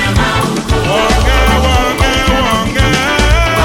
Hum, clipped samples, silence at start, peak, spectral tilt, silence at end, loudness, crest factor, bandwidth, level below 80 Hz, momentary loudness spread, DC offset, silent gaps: none; under 0.1%; 0 s; 0 dBFS; -4.5 dB/octave; 0 s; -11 LUFS; 10 dB; 17 kHz; -16 dBFS; 3 LU; under 0.1%; none